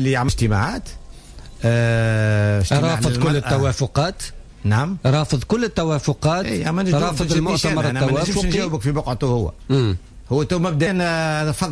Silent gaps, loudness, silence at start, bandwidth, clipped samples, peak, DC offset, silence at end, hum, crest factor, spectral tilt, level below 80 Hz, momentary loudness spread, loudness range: none; -20 LUFS; 0 s; 11 kHz; under 0.1%; -6 dBFS; under 0.1%; 0 s; none; 12 dB; -6 dB/octave; -34 dBFS; 5 LU; 1 LU